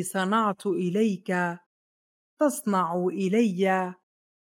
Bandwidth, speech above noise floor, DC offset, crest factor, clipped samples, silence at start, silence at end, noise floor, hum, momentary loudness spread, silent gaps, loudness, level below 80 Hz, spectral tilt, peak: 16.5 kHz; over 65 dB; under 0.1%; 16 dB; under 0.1%; 0 s; 0.6 s; under -90 dBFS; none; 4 LU; 1.66-2.37 s; -26 LUFS; -86 dBFS; -5.5 dB/octave; -10 dBFS